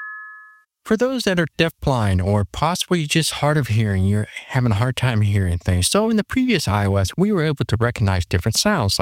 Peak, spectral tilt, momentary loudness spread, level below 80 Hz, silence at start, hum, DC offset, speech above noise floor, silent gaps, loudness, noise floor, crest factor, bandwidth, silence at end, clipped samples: -2 dBFS; -5 dB/octave; 3 LU; -40 dBFS; 0 s; none; under 0.1%; 29 dB; none; -19 LUFS; -47 dBFS; 16 dB; 16.5 kHz; 0 s; under 0.1%